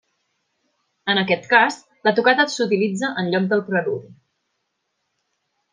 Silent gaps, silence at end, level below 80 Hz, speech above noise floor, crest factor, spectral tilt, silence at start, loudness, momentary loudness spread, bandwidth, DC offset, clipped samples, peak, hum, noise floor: none; 1.6 s; -72 dBFS; 56 dB; 20 dB; -4.5 dB/octave; 1.05 s; -19 LUFS; 7 LU; 9.8 kHz; under 0.1%; under 0.1%; -2 dBFS; none; -75 dBFS